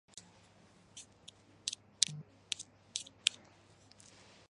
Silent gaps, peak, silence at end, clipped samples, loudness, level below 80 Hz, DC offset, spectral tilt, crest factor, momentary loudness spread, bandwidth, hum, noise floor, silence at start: none; -4 dBFS; 1.15 s; under 0.1%; -37 LUFS; -78 dBFS; under 0.1%; 0.5 dB/octave; 40 dB; 24 LU; 11.5 kHz; none; -64 dBFS; 0.15 s